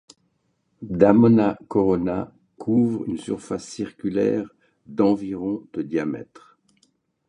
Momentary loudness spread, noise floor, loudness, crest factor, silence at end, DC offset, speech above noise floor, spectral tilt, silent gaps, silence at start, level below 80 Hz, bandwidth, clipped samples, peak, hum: 16 LU; -70 dBFS; -22 LUFS; 22 dB; 1.05 s; under 0.1%; 49 dB; -8 dB/octave; none; 0.8 s; -54 dBFS; 10.5 kHz; under 0.1%; -2 dBFS; none